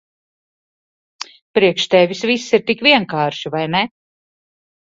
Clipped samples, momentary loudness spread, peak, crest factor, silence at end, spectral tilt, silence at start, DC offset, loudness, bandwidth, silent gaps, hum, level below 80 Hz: under 0.1%; 13 LU; 0 dBFS; 18 dB; 1 s; -4.5 dB/octave; 1.2 s; under 0.1%; -16 LUFS; 7.8 kHz; 1.42-1.54 s; none; -60 dBFS